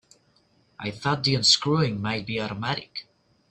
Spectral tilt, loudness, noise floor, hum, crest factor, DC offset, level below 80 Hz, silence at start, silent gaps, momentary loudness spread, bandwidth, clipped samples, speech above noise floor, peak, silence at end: -4 dB/octave; -24 LUFS; -64 dBFS; none; 22 dB; under 0.1%; -60 dBFS; 0.8 s; none; 17 LU; 10.5 kHz; under 0.1%; 39 dB; -4 dBFS; 0.5 s